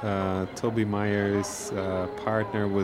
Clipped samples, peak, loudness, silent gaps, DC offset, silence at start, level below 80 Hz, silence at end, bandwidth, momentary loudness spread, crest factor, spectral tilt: under 0.1%; -10 dBFS; -28 LUFS; none; under 0.1%; 0 s; -56 dBFS; 0 s; 15.5 kHz; 4 LU; 16 dB; -6 dB/octave